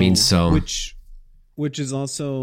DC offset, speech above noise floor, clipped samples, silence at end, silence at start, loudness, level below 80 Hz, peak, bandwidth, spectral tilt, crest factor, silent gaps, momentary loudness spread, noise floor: under 0.1%; 24 dB; under 0.1%; 0 s; 0 s; -20 LUFS; -34 dBFS; -4 dBFS; 16.5 kHz; -4.5 dB/octave; 16 dB; none; 13 LU; -43 dBFS